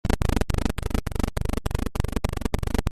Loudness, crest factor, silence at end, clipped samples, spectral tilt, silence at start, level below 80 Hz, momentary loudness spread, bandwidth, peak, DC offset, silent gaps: -28 LUFS; 18 dB; 0 s; under 0.1%; -6 dB/octave; 0.05 s; -28 dBFS; 4 LU; 14.5 kHz; -6 dBFS; under 0.1%; none